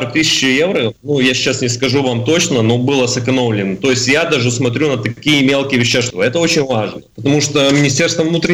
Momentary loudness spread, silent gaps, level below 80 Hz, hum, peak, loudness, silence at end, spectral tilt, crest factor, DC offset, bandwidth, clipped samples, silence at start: 5 LU; none; -48 dBFS; none; -4 dBFS; -13 LUFS; 0 s; -4 dB/octave; 10 dB; under 0.1%; 16 kHz; under 0.1%; 0 s